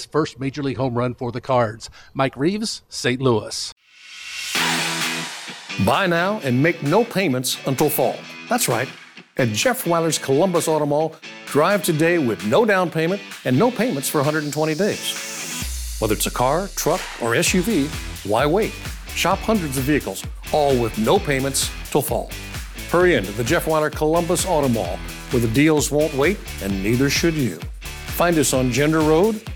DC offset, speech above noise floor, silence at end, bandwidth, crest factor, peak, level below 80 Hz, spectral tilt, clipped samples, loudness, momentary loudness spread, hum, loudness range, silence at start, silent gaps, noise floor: under 0.1%; 20 dB; 0 s; over 20 kHz; 16 dB; -4 dBFS; -38 dBFS; -4.5 dB/octave; under 0.1%; -20 LUFS; 10 LU; none; 3 LU; 0 s; 3.72-3.76 s; -40 dBFS